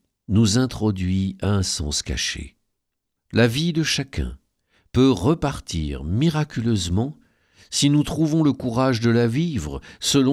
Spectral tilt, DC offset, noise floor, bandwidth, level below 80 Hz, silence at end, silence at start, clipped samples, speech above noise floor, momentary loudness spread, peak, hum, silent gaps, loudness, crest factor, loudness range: -5 dB/octave; under 0.1%; -79 dBFS; 14 kHz; -38 dBFS; 0 s; 0.3 s; under 0.1%; 58 dB; 9 LU; -6 dBFS; none; none; -22 LUFS; 16 dB; 2 LU